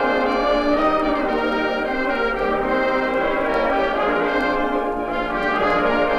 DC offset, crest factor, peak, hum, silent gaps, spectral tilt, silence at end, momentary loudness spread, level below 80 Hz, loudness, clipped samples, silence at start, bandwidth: under 0.1%; 12 dB; -8 dBFS; none; none; -5.5 dB/octave; 0 s; 3 LU; -38 dBFS; -20 LUFS; under 0.1%; 0 s; 13.5 kHz